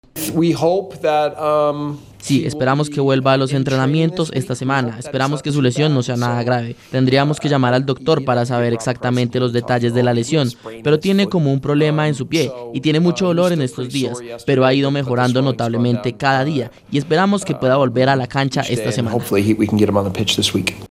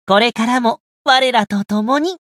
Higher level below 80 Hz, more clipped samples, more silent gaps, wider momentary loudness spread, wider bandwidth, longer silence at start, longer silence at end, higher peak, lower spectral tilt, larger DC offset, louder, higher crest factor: first, -52 dBFS vs -62 dBFS; neither; second, none vs 0.80-1.05 s; about the same, 6 LU vs 7 LU; first, 15.5 kHz vs 14 kHz; about the same, 0.15 s vs 0.1 s; about the same, 0.05 s vs 0.15 s; about the same, 0 dBFS vs 0 dBFS; first, -6 dB/octave vs -4 dB/octave; neither; about the same, -17 LUFS vs -15 LUFS; about the same, 16 dB vs 16 dB